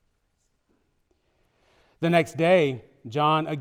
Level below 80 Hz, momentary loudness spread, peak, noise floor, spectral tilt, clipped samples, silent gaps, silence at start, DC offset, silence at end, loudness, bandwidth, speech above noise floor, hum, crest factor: -68 dBFS; 11 LU; -8 dBFS; -72 dBFS; -6.5 dB/octave; under 0.1%; none; 2 s; under 0.1%; 0 s; -23 LUFS; 15.5 kHz; 50 dB; none; 18 dB